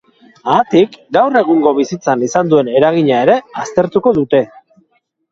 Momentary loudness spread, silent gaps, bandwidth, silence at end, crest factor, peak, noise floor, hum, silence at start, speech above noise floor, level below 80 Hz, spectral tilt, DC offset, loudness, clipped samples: 5 LU; none; 7.8 kHz; 0.85 s; 14 dB; 0 dBFS; -60 dBFS; none; 0.45 s; 48 dB; -54 dBFS; -6 dB/octave; under 0.1%; -13 LUFS; under 0.1%